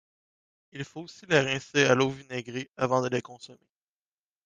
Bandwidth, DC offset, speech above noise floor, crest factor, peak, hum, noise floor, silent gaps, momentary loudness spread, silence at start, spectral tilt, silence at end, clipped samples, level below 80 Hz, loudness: 10 kHz; under 0.1%; over 62 dB; 22 dB; -8 dBFS; none; under -90 dBFS; 2.69-2.74 s; 20 LU; 0.75 s; -4.5 dB/octave; 0.9 s; under 0.1%; -68 dBFS; -27 LUFS